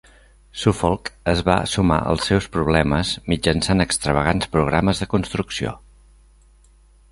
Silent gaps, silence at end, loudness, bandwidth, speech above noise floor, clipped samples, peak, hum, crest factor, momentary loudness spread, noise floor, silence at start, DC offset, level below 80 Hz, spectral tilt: none; 1.35 s; -20 LUFS; 11.5 kHz; 32 dB; under 0.1%; -2 dBFS; none; 20 dB; 7 LU; -52 dBFS; 0.55 s; under 0.1%; -34 dBFS; -5 dB/octave